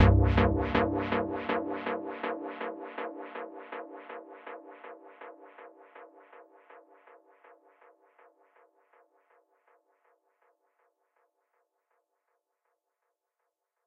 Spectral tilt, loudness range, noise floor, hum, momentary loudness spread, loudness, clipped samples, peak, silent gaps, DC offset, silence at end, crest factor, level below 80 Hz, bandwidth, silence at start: -6.5 dB/octave; 25 LU; -84 dBFS; none; 25 LU; -31 LUFS; under 0.1%; -8 dBFS; none; under 0.1%; 7.05 s; 26 dB; -42 dBFS; 5.4 kHz; 0 s